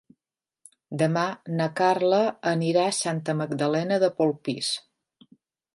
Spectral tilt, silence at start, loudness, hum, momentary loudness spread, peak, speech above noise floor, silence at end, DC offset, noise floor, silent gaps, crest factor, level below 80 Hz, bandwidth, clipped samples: -5 dB/octave; 0.9 s; -25 LUFS; none; 6 LU; -8 dBFS; over 66 dB; 0.95 s; under 0.1%; under -90 dBFS; none; 18 dB; -74 dBFS; 11.5 kHz; under 0.1%